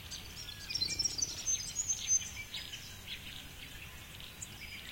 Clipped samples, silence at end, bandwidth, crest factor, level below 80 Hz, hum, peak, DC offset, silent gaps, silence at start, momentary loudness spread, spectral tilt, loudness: under 0.1%; 0 s; 16.5 kHz; 18 dB; -56 dBFS; none; -20 dBFS; under 0.1%; none; 0 s; 16 LU; 0 dB/octave; -36 LUFS